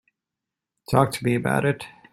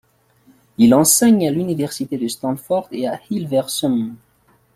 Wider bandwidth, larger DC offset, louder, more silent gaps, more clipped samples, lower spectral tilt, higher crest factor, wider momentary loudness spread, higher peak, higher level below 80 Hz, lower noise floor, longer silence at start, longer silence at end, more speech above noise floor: second, 14.5 kHz vs 16 kHz; neither; second, -23 LUFS vs -17 LUFS; neither; neither; first, -6.5 dB/octave vs -4.5 dB/octave; first, 22 dB vs 16 dB; second, 5 LU vs 13 LU; about the same, -2 dBFS vs -2 dBFS; about the same, -54 dBFS vs -56 dBFS; first, -86 dBFS vs -55 dBFS; about the same, 0.9 s vs 0.8 s; second, 0.25 s vs 0.6 s; first, 65 dB vs 37 dB